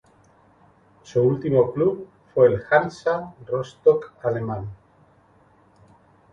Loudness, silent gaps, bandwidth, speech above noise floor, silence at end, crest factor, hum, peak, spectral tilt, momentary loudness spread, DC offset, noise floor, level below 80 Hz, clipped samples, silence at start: -22 LUFS; none; 7.6 kHz; 36 dB; 1.6 s; 20 dB; none; -2 dBFS; -8 dB/octave; 11 LU; under 0.1%; -57 dBFS; -56 dBFS; under 0.1%; 1.1 s